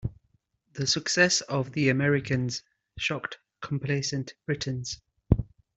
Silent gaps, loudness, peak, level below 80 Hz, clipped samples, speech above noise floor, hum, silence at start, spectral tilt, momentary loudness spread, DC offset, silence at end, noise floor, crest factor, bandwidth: none; -27 LUFS; -4 dBFS; -44 dBFS; under 0.1%; 43 dB; none; 0.05 s; -4 dB/octave; 15 LU; under 0.1%; 0.35 s; -71 dBFS; 24 dB; 8.2 kHz